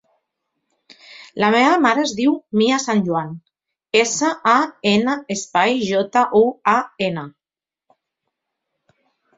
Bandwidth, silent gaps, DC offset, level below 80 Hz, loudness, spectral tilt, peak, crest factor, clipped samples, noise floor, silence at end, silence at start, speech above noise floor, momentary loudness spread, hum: 8 kHz; none; under 0.1%; -62 dBFS; -18 LUFS; -4 dB/octave; 0 dBFS; 18 dB; under 0.1%; under -90 dBFS; 2.1 s; 1.1 s; over 73 dB; 9 LU; none